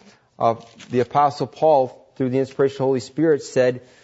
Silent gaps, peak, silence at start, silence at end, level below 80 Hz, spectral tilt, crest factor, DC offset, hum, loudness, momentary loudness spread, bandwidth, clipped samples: none; -6 dBFS; 0.4 s; 0.25 s; -64 dBFS; -6.5 dB/octave; 14 dB; under 0.1%; none; -21 LUFS; 7 LU; 8 kHz; under 0.1%